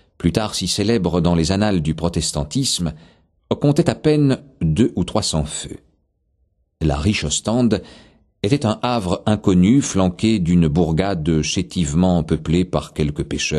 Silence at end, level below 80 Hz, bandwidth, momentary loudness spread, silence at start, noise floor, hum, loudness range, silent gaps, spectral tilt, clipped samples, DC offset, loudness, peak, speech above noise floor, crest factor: 0 s; -36 dBFS; 12.5 kHz; 6 LU; 0.2 s; -65 dBFS; none; 4 LU; none; -5.5 dB/octave; under 0.1%; under 0.1%; -19 LUFS; 0 dBFS; 47 dB; 18 dB